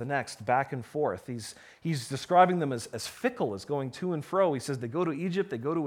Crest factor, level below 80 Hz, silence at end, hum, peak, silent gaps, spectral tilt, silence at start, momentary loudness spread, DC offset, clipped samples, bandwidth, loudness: 22 dB; -70 dBFS; 0 s; none; -8 dBFS; none; -5.5 dB/octave; 0 s; 12 LU; under 0.1%; under 0.1%; 16.5 kHz; -30 LUFS